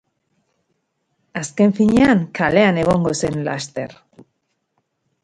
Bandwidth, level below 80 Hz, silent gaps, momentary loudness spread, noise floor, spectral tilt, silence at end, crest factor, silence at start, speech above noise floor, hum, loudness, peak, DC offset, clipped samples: 11 kHz; -48 dBFS; none; 14 LU; -71 dBFS; -6 dB/octave; 1.3 s; 18 dB; 1.35 s; 54 dB; none; -17 LUFS; 0 dBFS; under 0.1%; under 0.1%